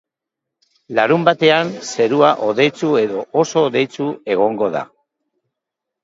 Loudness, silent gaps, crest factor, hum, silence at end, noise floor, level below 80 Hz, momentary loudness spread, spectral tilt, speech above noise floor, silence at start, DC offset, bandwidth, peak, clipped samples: -16 LUFS; none; 18 dB; none; 1.2 s; -82 dBFS; -66 dBFS; 9 LU; -5 dB/octave; 66 dB; 0.9 s; under 0.1%; 8 kHz; 0 dBFS; under 0.1%